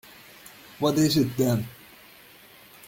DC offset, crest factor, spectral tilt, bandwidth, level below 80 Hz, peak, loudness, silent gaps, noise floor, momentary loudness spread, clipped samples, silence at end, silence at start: under 0.1%; 18 dB; -5.5 dB/octave; 17 kHz; -60 dBFS; -10 dBFS; -24 LUFS; none; -51 dBFS; 24 LU; under 0.1%; 1.15 s; 0.8 s